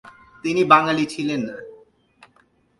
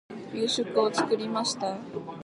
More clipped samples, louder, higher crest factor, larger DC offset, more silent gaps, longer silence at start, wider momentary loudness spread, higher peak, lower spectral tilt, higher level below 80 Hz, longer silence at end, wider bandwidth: neither; first, -19 LUFS vs -28 LUFS; about the same, 22 dB vs 18 dB; neither; neither; about the same, 0.05 s vs 0.1 s; first, 16 LU vs 11 LU; first, 0 dBFS vs -12 dBFS; first, -5 dB/octave vs -3.5 dB/octave; first, -64 dBFS vs -72 dBFS; first, 1.05 s vs 0 s; about the same, 11.5 kHz vs 11.5 kHz